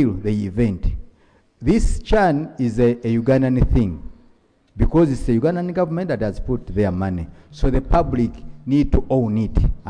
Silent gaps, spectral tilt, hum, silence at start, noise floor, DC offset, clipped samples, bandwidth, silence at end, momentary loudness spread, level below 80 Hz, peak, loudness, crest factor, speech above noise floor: none; -8.5 dB/octave; none; 0 s; -56 dBFS; under 0.1%; under 0.1%; 10 kHz; 0 s; 8 LU; -26 dBFS; -2 dBFS; -20 LUFS; 16 dB; 37 dB